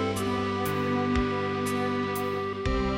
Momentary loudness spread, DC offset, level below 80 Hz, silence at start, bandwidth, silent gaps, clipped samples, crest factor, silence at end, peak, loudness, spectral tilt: 3 LU; under 0.1%; -40 dBFS; 0 s; 16.5 kHz; none; under 0.1%; 14 dB; 0 s; -14 dBFS; -28 LUFS; -6 dB/octave